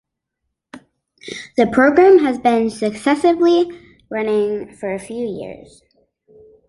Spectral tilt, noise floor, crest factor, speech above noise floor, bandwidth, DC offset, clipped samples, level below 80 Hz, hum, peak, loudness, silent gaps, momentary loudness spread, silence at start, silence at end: -5.5 dB/octave; -77 dBFS; 16 dB; 61 dB; 11.5 kHz; under 0.1%; under 0.1%; -54 dBFS; none; -2 dBFS; -16 LUFS; none; 16 LU; 0.75 s; 1.1 s